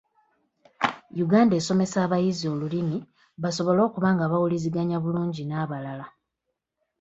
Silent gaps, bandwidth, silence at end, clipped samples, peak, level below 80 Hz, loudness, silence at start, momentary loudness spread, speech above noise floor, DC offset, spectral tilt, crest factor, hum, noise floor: none; 8 kHz; 0.9 s; under 0.1%; -6 dBFS; -64 dBFS; -25 LUFS; 0.8 s; 11 LU; 58 dB; under 0.1%; -6.5 dB/octave; 18 dB; none; -82 dBFS